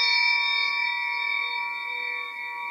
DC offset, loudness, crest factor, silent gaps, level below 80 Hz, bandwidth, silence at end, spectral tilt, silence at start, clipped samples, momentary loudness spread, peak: under 0.1%; -24 LUFS; 14 dB; none; under -90 dBFS; 16 kHz; 0 s; 3.5 dB/octave; 0 s; under 0.1%; 10 LU; -12 dBFS